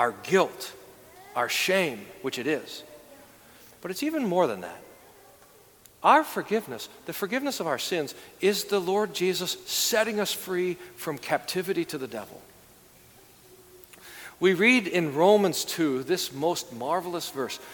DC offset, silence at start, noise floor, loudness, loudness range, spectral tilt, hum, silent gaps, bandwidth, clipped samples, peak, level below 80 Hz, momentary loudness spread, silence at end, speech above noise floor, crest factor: under 0.1%; 0 s; -55 dBFS; -26 LUFS; 8 LU; -3.5 dB/octave; none; none; 19 kHz; under 0.1%; -6 dBFS; -70 dBFS; 17 LU; 0 s; 29 dB; 22 dB